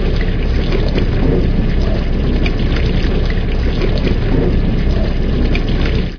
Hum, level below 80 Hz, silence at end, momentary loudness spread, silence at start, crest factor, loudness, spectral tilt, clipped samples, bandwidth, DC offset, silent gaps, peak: none; -14 dBFS; 0 s; 3 LU; 0 s; 12 dB; -17 LUFS; -8 dB/octave; under 0.1%; 5.4 kHz; under 0.1%; none; 0 dBFS